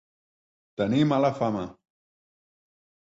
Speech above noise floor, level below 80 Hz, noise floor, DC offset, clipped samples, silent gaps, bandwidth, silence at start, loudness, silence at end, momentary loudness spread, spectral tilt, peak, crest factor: over 66 dB; -62 dBFS; under -90 dBFS; under 0.1%; under 0.1%; none; 7.8 kHz; 0.8 s; -25 LUFS; 1.35 s; 16 LU; -7.5 dB/octave; -10 dBFS; 18 dB